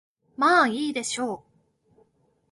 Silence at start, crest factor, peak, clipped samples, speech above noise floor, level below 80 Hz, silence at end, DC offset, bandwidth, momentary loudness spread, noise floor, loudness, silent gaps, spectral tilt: 0.4 s; 20 dB; -8 dBFS; under 0.1%; 42 dB; -72 dBFS; 1.15 s; under 0.1%; 11.5 kHz; 18 LU; -65 dBFS; -23 LUFS; none; -2.5 dB/octave